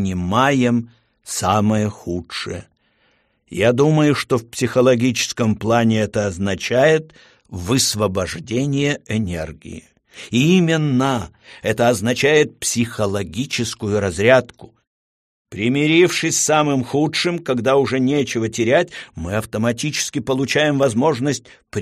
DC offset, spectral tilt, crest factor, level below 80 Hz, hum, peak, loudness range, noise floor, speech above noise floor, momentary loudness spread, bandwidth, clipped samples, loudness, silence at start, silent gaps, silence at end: under 0.1%; -4.5 dB/octave; 18 dB; -48 dBFS; none; 0 dBFS; 3 LU; -62 dBFS; 44 dB; 12 LU; 15 kHz; under 0.1%; -18 LUFS; 0 s; 14.87-15.45 s; 0 s